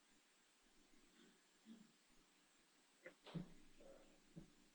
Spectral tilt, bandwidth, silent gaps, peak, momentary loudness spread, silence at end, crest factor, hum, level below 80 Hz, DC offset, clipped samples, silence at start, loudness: -5.5 dB/octave; over 20 kHz; none; -40 dBFS; 11 LU; 0 s; 24 dB; none; -76 dBFS; under 0.1%; under 0.1%; 0 s; -61 LUFS